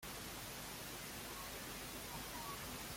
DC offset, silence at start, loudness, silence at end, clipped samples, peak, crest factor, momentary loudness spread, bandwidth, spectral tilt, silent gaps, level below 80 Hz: under 0.1%; 0 s; -47 LUFS; 0 s; under 0.1%; -34 dBFS; 14 dB; 1 LU; 16.5 kHz; -2.5 dB/octave; none; -62 dBFS